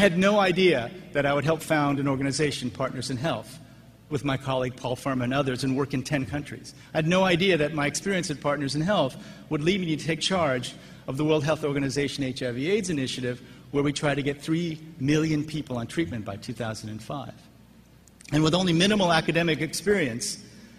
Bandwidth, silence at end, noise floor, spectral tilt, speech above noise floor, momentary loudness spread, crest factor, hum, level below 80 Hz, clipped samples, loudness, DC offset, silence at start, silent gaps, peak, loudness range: 15 kHz; 0.1 s; -53 dBFS; -5 dB/octave; 28 dB; 13 LU; 20 dB; none; -54 dBFS; under 0.1%; -26 LUFS; under 0.1%; 0 s; none; -6 dBFS; 4 LU